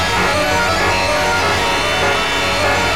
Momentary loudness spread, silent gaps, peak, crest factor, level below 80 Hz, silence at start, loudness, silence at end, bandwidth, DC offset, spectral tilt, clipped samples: 1 LU; none; -6 dBFS; 10 dB; -34 dBFS; 0 s; -14 LUFS; 0 s; over 20 kHz; 2%; -3 dB/octave; under 0.1%